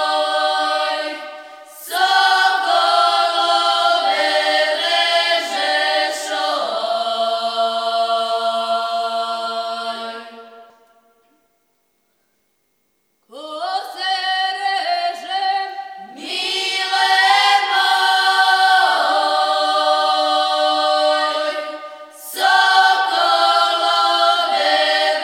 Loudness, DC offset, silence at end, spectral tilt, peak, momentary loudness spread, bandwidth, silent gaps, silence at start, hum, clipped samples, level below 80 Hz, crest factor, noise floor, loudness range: -16 LUFS; under 0.1%; 0 s; 1 dB/octave; 0 dBFS; 12 LU; 17 kHz; none; 0 s; none; under 0.1%; -86 dBFS; 16 dB; -67 dBFS; 11 LU